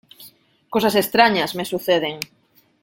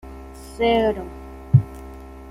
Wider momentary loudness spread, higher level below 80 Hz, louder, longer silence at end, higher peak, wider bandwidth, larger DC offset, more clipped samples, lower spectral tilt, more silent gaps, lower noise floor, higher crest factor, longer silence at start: second, 13 LU vs 21 LU; second, -62 dBFS vs -40 dBFS; about the same, -19 LUFS vs -21 LUFS; first, 0.6 s vs 0 s; about the same, -2 dBFS vs -2 dBFS; first, 17 kHz vs 14 kHz; neither; neither; second, -4 dB/octave vs -7.5 dB/octave; neither; first, -49 dBFS vs -38 dBFS; about the same, 20 dB vs 20 dB; first, 0.2 s vs 0.05 s